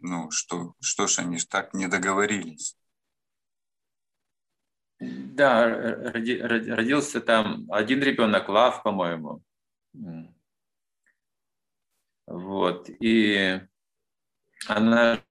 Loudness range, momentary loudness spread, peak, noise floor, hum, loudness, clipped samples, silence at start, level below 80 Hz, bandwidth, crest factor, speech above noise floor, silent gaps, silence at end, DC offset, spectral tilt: 11 LU; 18 LU; -4 dBFS; under -90 dBFS; none; -24 LUFS; under 0.1%; 0 s; -70 dBFS; 12 kHz; 22 dB; over 66 dB; none; 0.1 s; under 0.1%; -3.5 dB/octave